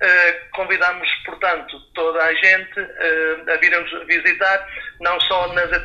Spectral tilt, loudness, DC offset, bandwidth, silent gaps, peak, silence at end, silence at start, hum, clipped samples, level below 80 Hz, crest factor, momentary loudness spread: -3 dB/octave; -17 LUFS; under 0.1%; 7.4 kHz; none; 0 dBFS; 0 s; 0 s; none; under 0.1%; -48 dBFS; 18 dB; 10 LU